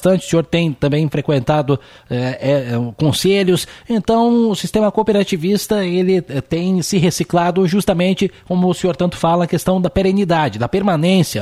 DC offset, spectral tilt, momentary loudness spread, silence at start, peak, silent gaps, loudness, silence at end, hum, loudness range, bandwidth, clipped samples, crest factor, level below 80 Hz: under 0.1%; -6 dB/octave; 5 LU; 0 s; -2 dBFS; none; -16 LUFS; 0 s; none; 1 LU; 15 kHz; under 0.1%; 14 dB; -42 dBFS